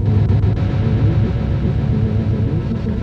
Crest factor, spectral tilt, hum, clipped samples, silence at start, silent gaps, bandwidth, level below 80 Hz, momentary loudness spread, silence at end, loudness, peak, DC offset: 12 dB; -10 dB/octave; none; under 0.1%; 0 s; none; 5.6 kHz; -24 dBFS; 3 LU; 0 s; -17 LUFS; -4 dBFS; under 0.1%